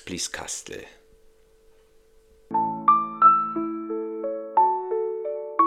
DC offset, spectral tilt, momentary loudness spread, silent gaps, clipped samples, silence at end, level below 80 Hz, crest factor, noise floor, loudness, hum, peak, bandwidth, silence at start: under 0.1%; -3.5 dB/octave; 15 LU; none; under 0.1%; 0 s; -62 dBFS; 20 dB; -57 dBFS; -23 LUFS; none; -6 dBFS; 15 kHz; 0.05 s